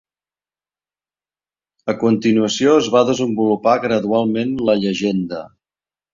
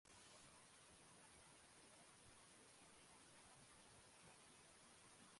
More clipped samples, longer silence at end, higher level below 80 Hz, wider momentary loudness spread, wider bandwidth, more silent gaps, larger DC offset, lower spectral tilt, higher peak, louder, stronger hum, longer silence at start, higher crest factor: neither; first, 0.65 s vs 0 s; first, -58 dBFS vs -86 dBFS; first, 9 LU vs 1 LU; second, 7.6 kHz vs 11.5 kHz; neither; neither; first, -5.5 dB/octave vs -2 dB/octave; first, -2 dBFS vs -52 dBFS; first, -17 LUFS vs -66 LUFS; neither; first, 1.85 s vs 0.05 s; about the same, 16 dB vs 16 dB